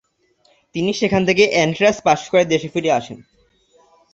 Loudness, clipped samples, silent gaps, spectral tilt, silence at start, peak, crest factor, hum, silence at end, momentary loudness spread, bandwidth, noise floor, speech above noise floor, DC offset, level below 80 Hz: -17 LUFS; under 0.1%; none; -4.5 dB/octave; 0.75 s; -2 dBFS; 18 dB; none; 1 s; 8 LU; 8 kHz; -60 dBFS; 43 dB; under 0.1%; -54 dBFS